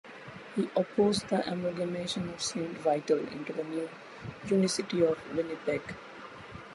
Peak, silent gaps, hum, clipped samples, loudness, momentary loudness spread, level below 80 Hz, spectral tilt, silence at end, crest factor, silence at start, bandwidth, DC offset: -14 dBFS; none; none; under 0.1%; -31 LUFS; 17 LU; -64 dBFS; -5 dB/octave; 0 s; 18 dB; 0.05 s; 11.5 kHz; under 0.1%